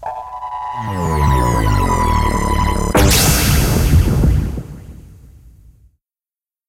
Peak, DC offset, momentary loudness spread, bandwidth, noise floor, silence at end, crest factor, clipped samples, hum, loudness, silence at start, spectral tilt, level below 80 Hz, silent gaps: -2 dBFS; under 0.1%; 15 LU; 16 kHz; under -90 dBFS; 1.6 s; 14 dB; under 0.1%; none; -15 LUFS; 0 s; -4.5 dB/octave; -20 dBFS; none